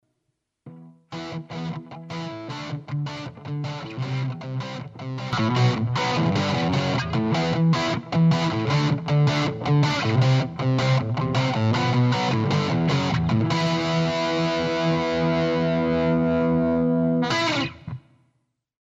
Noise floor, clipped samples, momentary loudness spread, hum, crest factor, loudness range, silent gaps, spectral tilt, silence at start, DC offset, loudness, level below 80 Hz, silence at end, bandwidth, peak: -77 dBFS; under 0.1%; 12 LU; none; 14 dB; 10 LU; none; -6.5 dB/octave; 0.65 s; under 0.1%; -23 LUFS; -50 dBFS; 0.9 s; 7.8 kHz; -10 dBFS